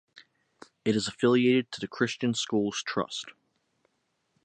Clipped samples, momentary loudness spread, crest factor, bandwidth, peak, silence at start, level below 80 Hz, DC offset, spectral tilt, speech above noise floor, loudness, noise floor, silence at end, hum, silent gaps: under 0.1%; 12 LU; 20 dB; 9.2 kHz; -10 dBFS; 0.15 s; -70 dBFS; under 0.1%; -4.5 dB/octave; 49 dB; -28 LUFS; -76 dBFS; 1.15 s; none; none